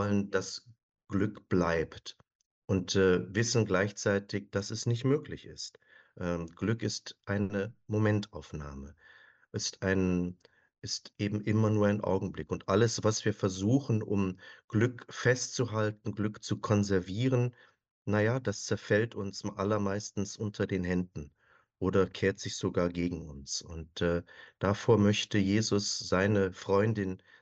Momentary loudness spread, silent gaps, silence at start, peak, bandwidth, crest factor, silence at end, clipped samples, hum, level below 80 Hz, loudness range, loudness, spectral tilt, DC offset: 12 LU; 0.83-0.89 s, 2.35-2.39 s, 2.46-2.62 s, 14.64-14.68 s, 17.91-18.05 s; 0 s; -12 dBFS; 8.4 kHz; 20 dB; 0.25 s; under 0.1%; none; -58 dBFS; 5 LU; -31 LUFS; -5.5 dB/octave; under 0.1%